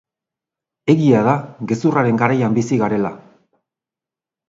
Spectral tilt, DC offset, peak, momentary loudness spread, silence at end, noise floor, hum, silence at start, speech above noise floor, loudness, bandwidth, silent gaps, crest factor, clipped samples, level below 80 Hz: -7.5 dB/octave; under 0.1%; 0 dBFS; 9 LU; 1.3 s; -88 dBFS; none; 0.85 s; 73 dB; -17 LUFS; 7.8 kHz; none; 18 dB; under 0.1%; -58 dBFS